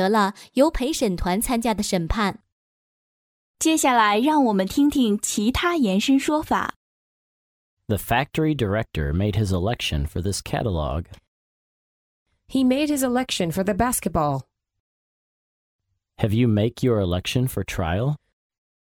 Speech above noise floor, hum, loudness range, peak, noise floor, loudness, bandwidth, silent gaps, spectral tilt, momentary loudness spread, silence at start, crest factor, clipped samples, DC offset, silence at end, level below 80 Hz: over 69 dB; none; 6 LU; -4 dBFS; under -90 dBFS; -22 LUFS; 18 kHz; 2.52-3.54 s, 6.76-7.77 s, 11.28-12.26 s, 14.80-15.79 s; -5 dB/octave; 7 LU; 0 s; 18 dB; under 0.1%; under 0.1%; 0.8 s; -40 dBFS